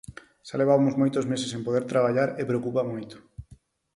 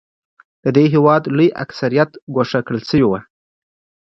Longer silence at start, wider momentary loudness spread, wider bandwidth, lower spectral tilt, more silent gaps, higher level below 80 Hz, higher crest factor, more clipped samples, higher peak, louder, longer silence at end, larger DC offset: second, 0.1 s vs 0.65 s; first, 21 LU vs 9 LU; first, 11.5 kHz vs 7.2 kHz; second, -6.5 dB/octave vs -8 dB/octave; second, none vs 2.22-2.27 s; second, -58 dBFS vs -50 dBFS; about the same, 18 dB vs 16 dB; neither; second, -8 dBFS vs 0 dBFS; second, -25 LUFS vs -16 LUFS; second, 0.55 s vs 0.9 s; neither